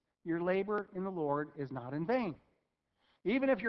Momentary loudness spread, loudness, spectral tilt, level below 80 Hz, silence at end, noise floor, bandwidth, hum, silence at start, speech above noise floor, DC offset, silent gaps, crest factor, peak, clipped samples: 8 LU; -36 LUFS; -6 dB/octave; -72 dBFS; 0 s; -81 dBFS; 6 kHz; none; 0.25 s; 46 dB; under 0.1%; none; 18 dB; -18 dBFS; under 0.1%